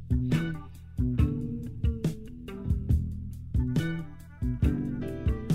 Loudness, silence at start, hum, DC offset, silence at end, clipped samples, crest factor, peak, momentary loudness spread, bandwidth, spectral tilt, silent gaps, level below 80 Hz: -31 LUFS; 0 s; none; under 0.1%; 0 s; under 0.1%; 16 dB; -14 dBFS; 12 LU; 14.5 kHz; -8 dB/octave; none; -34 dBFS